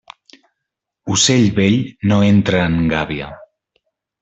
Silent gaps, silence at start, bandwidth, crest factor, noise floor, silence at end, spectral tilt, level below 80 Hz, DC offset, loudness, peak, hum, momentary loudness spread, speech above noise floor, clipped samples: none; 1.05 s; 8.4 kHz; 14 dB; -80 dBFS; 0.75 s; -4.5 dB/octave; -44 dBFS; under 0.1%; -15 LUFS; -2 dBFS; none; 13 LU; 65 dB; under 0.1%